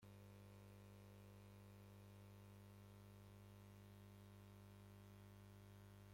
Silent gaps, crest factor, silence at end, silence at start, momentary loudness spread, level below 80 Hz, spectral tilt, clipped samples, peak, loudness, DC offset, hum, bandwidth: none; 10 dB; 0 s; 0 s; 0 LU; -76 dBFS; -6 dB/octave; under 0.1%; -52 dBFS; -64 LUFS; under 0.1%; 50 Hz at -65 dBFS; 16.5 kHz